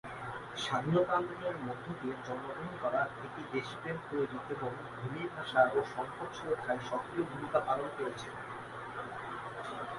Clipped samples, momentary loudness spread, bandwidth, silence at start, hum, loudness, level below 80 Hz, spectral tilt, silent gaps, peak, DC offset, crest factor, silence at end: under 0.1%; 12 LU; 11.5 kHz; 0.05 s; none; -36 LUFS; -66 dBFS; -6 dB/octave; none; -14 dBFS; under 0.1%; 22 dB; 0 s